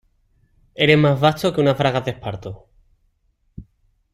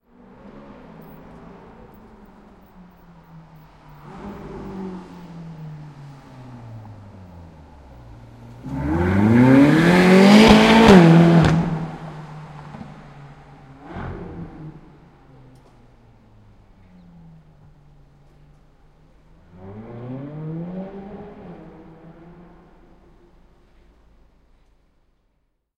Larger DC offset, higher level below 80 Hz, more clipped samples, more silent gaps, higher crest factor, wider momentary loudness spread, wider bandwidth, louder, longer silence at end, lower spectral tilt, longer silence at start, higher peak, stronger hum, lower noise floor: neither; second, -50 dBFS vs -42 dBFS; neither; neither; about the same, 20 dB vs 22 dB; second, 19 LU vs 29 LU; about the same, 15 kHz vs 14 kHz; second, -18 LUFS vs -13 LUFS; second, 0.5 s vs 4.25 s; about the same, -6.5 dB/octave vs -6.5 dB/octave; second, 0.8 s vs 4.25 s; about the same, -2 dBFS vs 0 dBFS; neither; second, -65 dBFS vs -69 dBFS